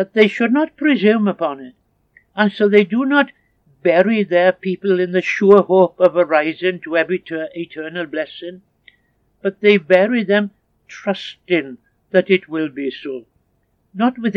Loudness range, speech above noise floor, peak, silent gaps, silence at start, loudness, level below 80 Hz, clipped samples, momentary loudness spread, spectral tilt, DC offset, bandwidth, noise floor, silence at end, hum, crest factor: 7 LU; 48 dB; 0 dBFS; none; 0 s; -17 LUFS; -66 dBFS; under 0.1%; 14 LU; -7 dB/octave; under 0.1%; 7 kHz; -64 dBFS; 0 s; none; 18 dB